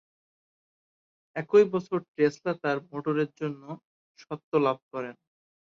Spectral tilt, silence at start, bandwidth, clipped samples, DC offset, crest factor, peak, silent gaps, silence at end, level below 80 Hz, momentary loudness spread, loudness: -7 dB/octave; 1.35 s; 7.2 kHz; under 0.1%; under 0.1%; 20 dB; -8 dBFS; 2.08-2.14 s, 3.85-4.15 s, 4.43-4.52 s, 4.82-4.91 s; 0.65 s; -76 dBFS; 19 LU; -28 LUFS